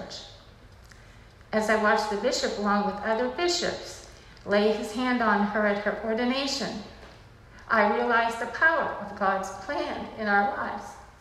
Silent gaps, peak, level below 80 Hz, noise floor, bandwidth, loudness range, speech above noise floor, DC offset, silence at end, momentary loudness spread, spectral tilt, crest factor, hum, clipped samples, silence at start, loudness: none; -8 dBFS; -54 dBFS; -50 dBFS; 13.5 kHz; 1 LU; 24 dB; under 0.1%; 0.1 s; 16 LU; -4 dB/octave; 18 dB; none; under 0.1%; 0 s; -26 LUFS